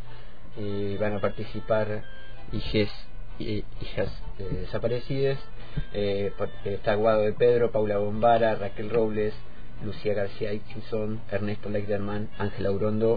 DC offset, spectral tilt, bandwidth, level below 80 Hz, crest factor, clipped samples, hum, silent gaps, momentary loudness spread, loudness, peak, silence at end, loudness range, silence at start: 4%; -9 dB/octave; 5 kHz; -42 dBFS; 18 dB; under 0.1%; none; none; 16 LU; -28 LUFS; -10 dBFS; 0 s; 7 LU; 0 s